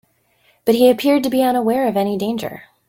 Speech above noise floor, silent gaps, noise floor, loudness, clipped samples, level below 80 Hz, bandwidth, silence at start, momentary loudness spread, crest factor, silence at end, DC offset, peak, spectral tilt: 43 dB; none; -59 dBFS; -17 LUFS; under 0.1%; -58 dBFS; 17 kHz; 0.65 s; 10 LU; 16 dB; 0.25 s; under 0.1%; -2 dBFS; -5.5 dB/octave